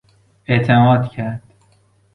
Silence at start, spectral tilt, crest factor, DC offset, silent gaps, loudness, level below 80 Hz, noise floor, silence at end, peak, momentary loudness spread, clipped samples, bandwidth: 0.5 s; -9 dB/octave; 16 dB; under 0.1%; none; -16 LUFS; -50 dBFS; -56 dBFS; 0.75 s; -2 dBFS; 19 LU; under 0.1%; 4.4 kHz